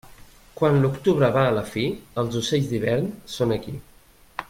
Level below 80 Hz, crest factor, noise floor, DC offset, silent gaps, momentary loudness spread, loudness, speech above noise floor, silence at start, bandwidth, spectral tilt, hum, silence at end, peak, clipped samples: -50 dBFS; 16 dB; -47 dBFS; under 0.1%; none; 10 LU; -23 LUFS; 25 dB; 0.05 s; 16 kHz; -6.5 dB/octave; none; 0.05 s; -6 dBFS; under 0.1%